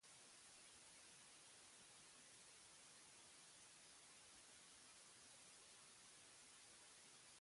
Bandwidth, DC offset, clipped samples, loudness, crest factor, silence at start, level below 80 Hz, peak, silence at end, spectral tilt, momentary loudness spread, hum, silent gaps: 11.5 kHz; under 0.1%; under 0.1%; -63 LUFS; 14 dB; 0 s; under -90 dBFS; -52 dBFS; 0 s; 0 dB/octave; 0 LU; none; none